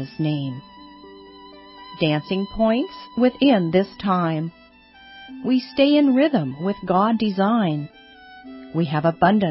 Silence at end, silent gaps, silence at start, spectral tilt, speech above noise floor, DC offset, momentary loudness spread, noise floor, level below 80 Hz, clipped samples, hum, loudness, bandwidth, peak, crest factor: 0 s; none; 0 s; -11.5 dB/octave; 29 dB; under 0.1%; 18 LU; -49 dBFS; -52 dBFS; under 0.1%; none; -21 LUFS; 5.8 kHz; -4 dBFS; 18 dB